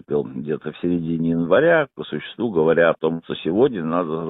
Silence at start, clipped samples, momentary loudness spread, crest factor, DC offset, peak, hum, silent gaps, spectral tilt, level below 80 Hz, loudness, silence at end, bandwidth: 0.1 s; under 0.1%; 11 LU; 16 dB; under 0.1%; -4 dBFS; none; none; -10.5 dB/octave; -54 dBFS; -20 LUFS; 0 s; 4 kHz